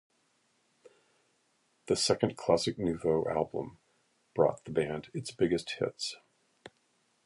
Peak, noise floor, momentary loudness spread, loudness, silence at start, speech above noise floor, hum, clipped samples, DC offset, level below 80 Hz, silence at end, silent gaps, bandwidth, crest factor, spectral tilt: -10 dBFS; -73 dBFS; 11 LU; -32 LUFS; 1.85 s; 42 dB; none; under 0.1%; under 0.1%; -62 dBFS; 1.1 s; none; 11.5 kHz; 24 dB; -4.5 dB/octave